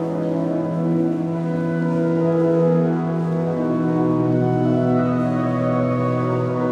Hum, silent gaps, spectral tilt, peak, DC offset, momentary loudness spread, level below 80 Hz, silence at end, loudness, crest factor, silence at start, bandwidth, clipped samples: none; none; -10 dB/octave; -8 dBFS; under 0.1%; 4 LU; -56 dBFS; 0 s; -20 LUFS; 12 dB; 0 s; 7 kHz; under 0.1%